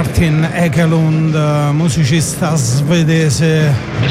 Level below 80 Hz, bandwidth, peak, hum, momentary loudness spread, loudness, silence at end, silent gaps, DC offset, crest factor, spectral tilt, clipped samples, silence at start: -34 dBFS; 15 kHz; -4 dBFS; none; 2 LU; -13 LUFS; 0 s; none; under 0.1%; 8 dB; -6 dB/octave; under 0.1%; 0 s